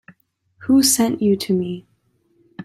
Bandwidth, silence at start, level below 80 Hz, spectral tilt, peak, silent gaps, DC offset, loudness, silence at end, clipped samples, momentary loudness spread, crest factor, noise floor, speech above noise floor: 15.5 kHz; 0.6 s; -62 dBFS; -4 dB/octave; -2 dBFS; none; under 0.1%; -17 LUFS; 0 s; under 0.1%; 17 LU; 18 dB; -63 dBFS; 45 dB